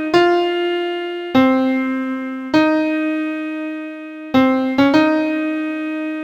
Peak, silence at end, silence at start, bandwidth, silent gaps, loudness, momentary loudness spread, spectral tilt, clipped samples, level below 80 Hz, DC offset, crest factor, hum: 0 dBFS; 0 s; 0 s; 8.2 kHz; none; -18 LUFS; 11 LU; -5.5 dB/octave; under 0.1%; -56 dBFS; under 0.1%; 16 dB; none